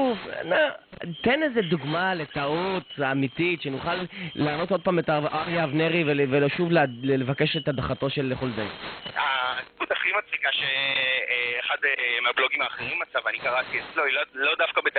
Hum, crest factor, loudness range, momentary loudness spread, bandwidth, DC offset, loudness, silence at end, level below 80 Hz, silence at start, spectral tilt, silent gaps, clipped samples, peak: none; 16 dB; 3 LU; 7 LU; 4.6 kHz; under 0.1%; -25 LUFS; 0 s; -58 dBFS; 0 s; -9.5 dB/octave; none; under 0.1%; -10 dBFS